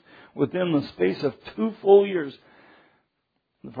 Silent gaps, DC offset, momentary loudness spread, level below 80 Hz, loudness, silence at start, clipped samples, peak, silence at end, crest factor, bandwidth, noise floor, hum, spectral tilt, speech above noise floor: none; under 0.1%; 16 LU; -66 dBFS; -23 LUFS; 0.35 s; under 0.1%; -4 dBFS; 0 s; 20 dB; 5 kHz; -76 dBFS; none; -9 dB/octave; 54 dB